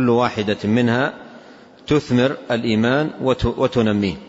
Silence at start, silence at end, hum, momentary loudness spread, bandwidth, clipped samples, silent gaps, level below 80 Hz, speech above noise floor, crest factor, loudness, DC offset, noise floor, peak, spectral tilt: 0 s; 0 s; none; 5 LU; 8 kHz; under 0.1%; none; -42 dBFS; 25 dB; 14 dB; -19 LUFS; under 0.1%; -43 dBFS; -4 dBFS; -7 dB/octave